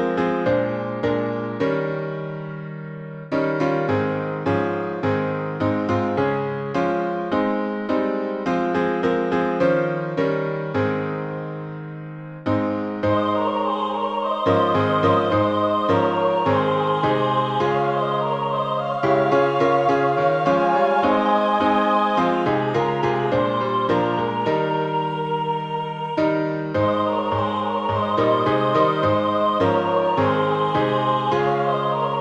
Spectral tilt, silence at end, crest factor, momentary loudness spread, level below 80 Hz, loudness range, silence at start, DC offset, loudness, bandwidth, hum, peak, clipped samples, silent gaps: -7.5 dB/octave; 0 s; 16 dB; 7 LU; -56 dBFS; 5 LU; 0 s; under 0.1%; -21 LUFS; 8.2 kHz; none; -6 dBFS; under 0.1%; none